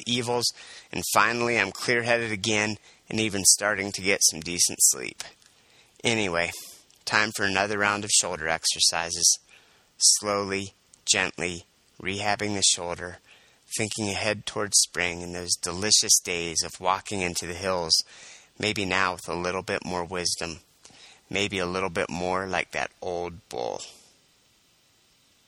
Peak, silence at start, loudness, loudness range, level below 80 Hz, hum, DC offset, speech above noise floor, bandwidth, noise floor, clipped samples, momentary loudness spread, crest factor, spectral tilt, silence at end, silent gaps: -4 dBFS; 0 s; -24 LUFS; 7 LU; -58 dBFS; none; under 0.1%; 37 dB; 19 kHz; -63 dBFS; under 0.1%; 14 LU; 24 dB; -1.5 dB/octave; 1.55 s; none